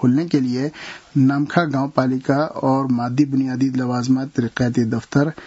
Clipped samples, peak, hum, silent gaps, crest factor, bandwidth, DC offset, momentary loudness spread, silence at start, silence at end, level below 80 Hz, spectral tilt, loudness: under 0.1%; 0 dBFS; none; none; 18 dB; 8 kHz; under 0.1%; 5 LU; 0 s; 0 s; -56 dBFS; -7.5 dB/octave; -20 LUFS